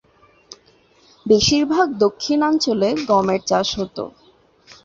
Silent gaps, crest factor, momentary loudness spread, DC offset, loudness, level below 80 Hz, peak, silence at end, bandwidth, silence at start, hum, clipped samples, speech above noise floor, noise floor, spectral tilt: none; 16 dB; 12 LU; under 0.1%; -18 LUFS; -48 dBFS; -2 dBFS; 0.75 s; 7.8 kHz; 0.5 s; none; under 0.1%; 37 dB; -55 dBFS; -4 dB/octave